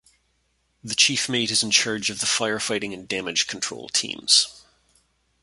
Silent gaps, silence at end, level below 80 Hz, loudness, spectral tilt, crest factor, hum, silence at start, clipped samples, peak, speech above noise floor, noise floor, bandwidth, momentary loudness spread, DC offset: none; 0.85 s; -64 dBFS; -21 LUFS; -1 dB/octave; 22 dB; none; 0.85 s; under 0.1%; -4 dBFS; 45 dB; -69 dBFS; 12 kHz; 11 LU; under 0.1%